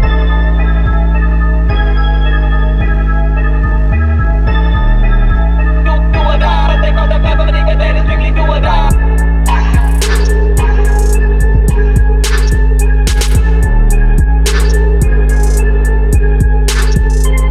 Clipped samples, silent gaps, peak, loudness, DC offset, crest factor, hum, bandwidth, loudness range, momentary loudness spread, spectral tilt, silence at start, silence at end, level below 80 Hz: under 0.1%; none; 0 dBFS; -12 LUFS; under 0.1%; 8 dB; none; 12.5 kHz; 1 LU; 1 LU; -6 dB/octave; 0 s; 0 s; -8 dBFS